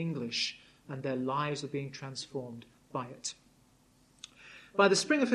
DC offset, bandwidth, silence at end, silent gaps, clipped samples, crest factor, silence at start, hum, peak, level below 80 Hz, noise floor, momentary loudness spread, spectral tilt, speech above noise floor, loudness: under 0.1%; 12 kHz; 0 s; none; under 0.1%; 22 dB; 0 s; none; -12 dBFS; -72 dBFS; -65 dBFS; 25 LU; -4 dB/octave; 33 dB; -33 LUFS